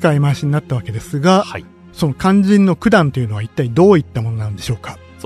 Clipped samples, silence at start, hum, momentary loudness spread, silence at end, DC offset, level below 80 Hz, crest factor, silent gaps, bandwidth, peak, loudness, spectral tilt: under 0.1%; 0 s; none; 12 LU; 0 s; under 0.1%; -44 dBFS; 14 dB; none; 13.5 kHz; 0 dBFS; -15 LUFS; -7 dB/octave